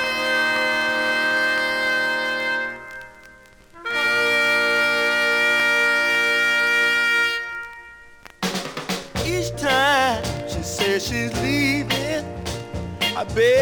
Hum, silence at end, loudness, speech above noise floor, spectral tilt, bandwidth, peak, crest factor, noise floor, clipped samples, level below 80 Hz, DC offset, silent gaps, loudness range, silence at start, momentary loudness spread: none; 0 s; -20 LUFS; 28 dB; -3 dB/octave; over 20 kHz; -6 dBFS; 16 dB; -47 dBFS; under 0.1%; -44 dBFS; under 0.1%; none; 6 LU; 0 s; 13 LU